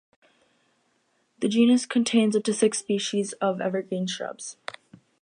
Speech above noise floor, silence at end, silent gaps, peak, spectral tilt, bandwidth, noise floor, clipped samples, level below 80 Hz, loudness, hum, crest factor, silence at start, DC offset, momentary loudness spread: 46 dB; 0.7 s; none; -8 dBFS; -4.5 dB/octave; 10.5 kHz; -70 dBFS; under 0.1%; -76 dBFS; -24 LUFS; none; 18 dB; 1.4 s; under 0.1%; 15 LU